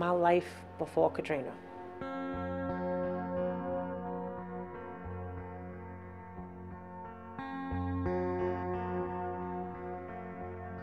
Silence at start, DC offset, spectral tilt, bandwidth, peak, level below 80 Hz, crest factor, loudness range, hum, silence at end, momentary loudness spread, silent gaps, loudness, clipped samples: 0 s; under 0.1%; -8 dB/octave; 12 kHz; -14 dBFS; -58 dBFS; 22 dB; 8 LU; none; 0 s; 15 LU; none; -37 LUFS; under 0.1%